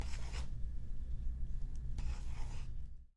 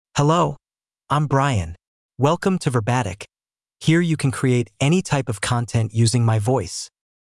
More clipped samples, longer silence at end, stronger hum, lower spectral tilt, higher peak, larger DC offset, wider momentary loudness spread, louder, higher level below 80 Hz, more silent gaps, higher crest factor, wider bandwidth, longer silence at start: neither; second, 0.1 s vs 0.35 s; neither; about the same, -5.5 dB/octave vs -6 dB/octave; second, -26 dBFS vs -4 dBFS; neither; second, 4 LU vs 11 LU; second, -47 LUFS vs -20 LUFS; first, -40 dBFS vs -50 dBFS; second, none vs 1.87-2.09 s; about the same, 12 dB vs 16 dB; second, 10.5 kHz vs 12 kHz; second, 0 s vs 0.15 s